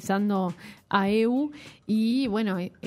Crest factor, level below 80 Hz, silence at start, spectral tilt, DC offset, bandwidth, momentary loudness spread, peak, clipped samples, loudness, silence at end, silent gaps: 18 dB; -64 dBFS; 0 s; -6.5 dB/octave; under 0.1%; 14.5 kHz; 10 LU; -8 dBFS; under 0.1%; -26 LUFS; 0 s; none